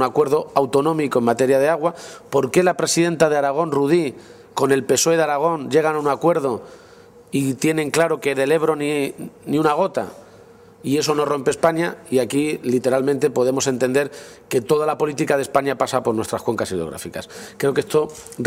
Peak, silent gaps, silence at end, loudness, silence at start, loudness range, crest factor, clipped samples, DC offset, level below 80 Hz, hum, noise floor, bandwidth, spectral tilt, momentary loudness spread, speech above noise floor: -2 dBFS; none; 0 s; -20 LUFS; 0 s; 3 LU; 18 dB; under 0.1%; under 0.1%; -58 dBFS; none; -46 dBFS; 16 kHz; -4.5 dB/octave; 10 LU; 27 dB